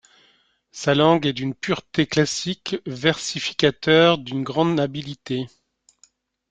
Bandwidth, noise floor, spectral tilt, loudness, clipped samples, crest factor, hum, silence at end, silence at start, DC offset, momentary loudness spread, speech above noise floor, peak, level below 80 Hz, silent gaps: 9.4 kHz; -61 dBFS; -5 dB/octave; -21 LUFS; under 0.1%; 20 dB; none; 1.05 s; 0.75 s; under 0.1%; 12 LU; 40 dB; -2 dBFS; -58 dBFS; none